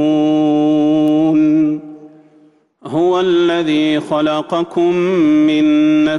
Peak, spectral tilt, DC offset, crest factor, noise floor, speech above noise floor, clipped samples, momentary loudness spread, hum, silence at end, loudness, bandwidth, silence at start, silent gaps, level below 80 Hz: -6 dBFS; -7 dB/octave; under 0.1%; 8 dB; -50 dBFS; 37 dB; under 0.1%; 5 LU; none; 0 s; -14 LUFS; 6.8 kHz; 0 s; none; -56 dBFS